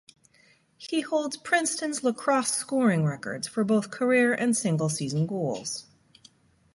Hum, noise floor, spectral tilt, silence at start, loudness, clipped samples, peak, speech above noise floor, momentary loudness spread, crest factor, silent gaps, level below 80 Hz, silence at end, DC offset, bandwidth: none; -62 dBFS; -4.5 dB/octave; 0.8 s; -26 LUFS; under 0.1%; -8 dBFS; 36 dB; 9 LU; 18 dB; none; -70 dBFS; 0.95 s; under 0.1%; 11.5 kHz